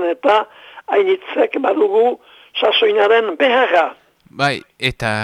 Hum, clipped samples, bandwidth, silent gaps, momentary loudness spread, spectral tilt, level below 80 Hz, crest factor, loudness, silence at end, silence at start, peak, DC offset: none; under 0.1%; 12 kHz; none; 9 LU; -5 dB/octave; -50 dBFS; 14 dB; -16 LUFS; 0 s; 0 s; -2 dBFS; under 0.1%